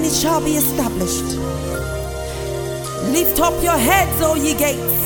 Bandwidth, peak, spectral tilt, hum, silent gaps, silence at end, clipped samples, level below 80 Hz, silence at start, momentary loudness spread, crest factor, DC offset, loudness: 17.5 kHz; -2 dBFS; -4 dB/octave; none; none; 0 s; under 0.1%; -32 dBFS; 0 s; 10 LU; 16 dB; under 0.1%; -18 LUFS